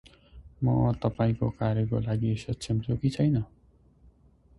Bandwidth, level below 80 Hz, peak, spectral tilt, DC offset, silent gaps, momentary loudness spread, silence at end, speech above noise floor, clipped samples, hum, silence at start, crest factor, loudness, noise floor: 11.5 kHz; -48 dBFS; -12 dBFS; -8 dB/octave; under 0.1%; none; 5 LU; 1.15 s; 33 dB; under 0.1%; none; 0.35 s; 18 dB; -28 LUFS; -59 dBFS